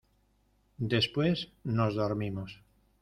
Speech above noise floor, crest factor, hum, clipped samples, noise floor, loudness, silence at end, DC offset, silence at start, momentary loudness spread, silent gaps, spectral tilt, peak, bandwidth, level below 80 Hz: 39 dB; 18 dB; none; under 0.1%; -70 dBFS; -31 LUFS; 0.45 s; under 0.1%; 0.8 s; 11 LU; none; -7 dB/octave; -14 dBFS; 12 kHz; -60 dBFS